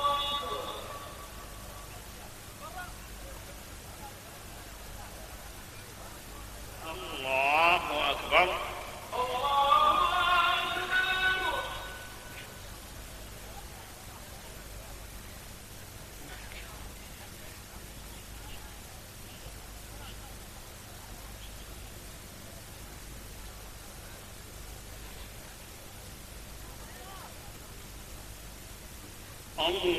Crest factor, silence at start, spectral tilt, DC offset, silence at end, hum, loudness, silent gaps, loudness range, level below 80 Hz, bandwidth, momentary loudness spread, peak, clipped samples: 28 dB; 0 s; -2.5 dB/octave; under 0.1%; 0 s; none; -29 LUFS; none; 19 LU; -50 dBFS; 14.5 kHz; 20 LU; -8 dBFS; under 0.1%